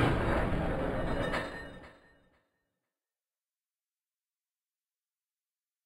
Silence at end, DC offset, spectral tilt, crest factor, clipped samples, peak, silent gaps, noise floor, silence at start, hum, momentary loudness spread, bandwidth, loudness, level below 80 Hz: 3.95 s; under 0.1%; -7 dB/octave; 22 dB; under 0.1%; -14 dBFS; none; under -90 dBFS; 0 s; none; 15 LU; 15.5 kHz; -33 LUFS; -44 dBFS